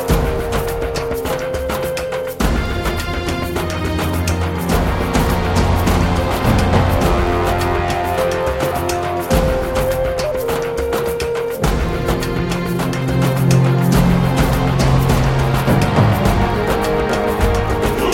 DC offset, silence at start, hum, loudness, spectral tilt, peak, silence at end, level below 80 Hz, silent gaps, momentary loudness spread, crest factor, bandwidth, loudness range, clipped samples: 0.1%; 0 s; none; -17 LUFS; -6 dB/octave; -2 dBFS; 0 s; -24 dBFS; none; 7 LU; 14 dB; 17 kHz; 5 LU; under 0.1%